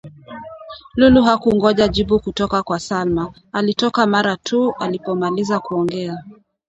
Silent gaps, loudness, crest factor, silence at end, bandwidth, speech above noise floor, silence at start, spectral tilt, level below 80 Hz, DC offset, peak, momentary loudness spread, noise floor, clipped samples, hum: none; -17 LUFS; 18 dB; 0.35 s; 8.2 kHz; 19 dB; 0.05 s; -5.5 dB/octave; -40 dBFS; under 0.1%; 0 dBFS; 19 LU; -36 dBFS; under 0.1%; none